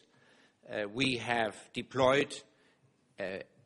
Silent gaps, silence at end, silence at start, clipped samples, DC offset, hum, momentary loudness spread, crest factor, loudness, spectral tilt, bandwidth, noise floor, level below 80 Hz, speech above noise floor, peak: none; 0.25 s; 0.65 s; under 0.1%; under 0.1%; none; 14 LU; 22 dB; -33 LUFS; -4.5 dB/octave; 11.5 kHz; -69 dBFS; -64 dBFS; 37 dB; -14 dBFS